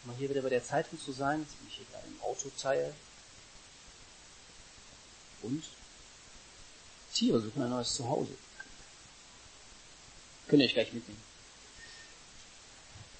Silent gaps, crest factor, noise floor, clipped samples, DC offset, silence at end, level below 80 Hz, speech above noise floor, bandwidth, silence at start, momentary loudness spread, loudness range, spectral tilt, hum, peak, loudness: none; 26 dB; -55 dBFS; under 0.1%; under 0.1%; 0 s; -64 dBFS; 22 dB; 8.4 kHz; 0 s; 23 LU; 12 LU; -4 dB/octave; none; -12 dBFS; -34 LUFS